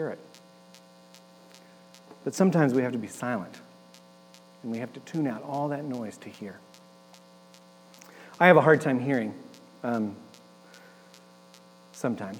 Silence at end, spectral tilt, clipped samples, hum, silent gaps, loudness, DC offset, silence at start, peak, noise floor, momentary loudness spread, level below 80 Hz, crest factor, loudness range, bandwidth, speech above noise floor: 0 s; -6.5 dB/octave; under 0.1%; 60 Hz at -55 dBFS; none; -26 LUFS; under 0.1%; 0 s; -4 dBFS; -54 dBFS; 25 LU; -86 dBFS; 26 dB; 10 LU; 18 kHz; 28 dB